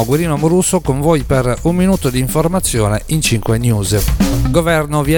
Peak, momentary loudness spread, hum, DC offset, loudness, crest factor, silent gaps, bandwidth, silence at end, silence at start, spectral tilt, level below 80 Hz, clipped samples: 0 dBFS; 2 LU; none; under 0.1%; -14 LUFS; 14 dB; none; 19.5 kHz; 0 s; 0 s; -5.5 dB/octave; -24 dBFS; under 0.1%